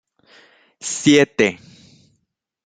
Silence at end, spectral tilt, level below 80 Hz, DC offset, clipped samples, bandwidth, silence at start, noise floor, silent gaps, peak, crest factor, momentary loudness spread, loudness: 1.1 s; -4 dB/octave; -60 dBFS; under 0.1%; under 0.1%; 9.4 kHz; 0.85 s; -73 dBFS; none; 0 dBFS; 20 dB; 17 LU; -17 LUFS